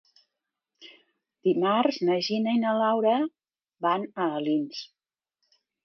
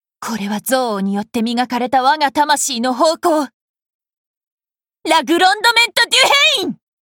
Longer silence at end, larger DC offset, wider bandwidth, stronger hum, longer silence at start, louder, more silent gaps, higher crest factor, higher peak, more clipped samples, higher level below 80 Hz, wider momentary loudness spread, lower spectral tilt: first, 1 s vs 0.3 s; neither; second, 6.6 kHz vs 19 kHz; neither; first, 0.8 s vs 0.2 s; second, -26 LUFS vs -14 LUFS; second, none vs 3.54-3.74 s, 3.82-3.86 s, 3.94-4.00 s, 4.17-4.41 s, 4.47-4.58 s; about the same, 18 dB vs 16 dB; second, -10 dBFS vs 0 dBFS; neither; second, -82 dBFS vs -62 dBFS; about the same, 9 LU vs 11 LU; first, -6 dB/octave vs -2 dB/octave